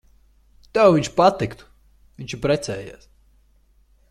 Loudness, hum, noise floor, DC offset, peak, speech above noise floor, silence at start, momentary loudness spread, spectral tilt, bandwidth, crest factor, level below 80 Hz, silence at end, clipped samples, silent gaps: -20 LUFS; none; -58 dBFS; under 0.1%; -2 dBFS; 38 dB; 0.75 s; 18 LU; -5.5 dB/octave; 12.5 kHz; 20 dB; -50 dBFS; 1.2 s; under 0.1%; none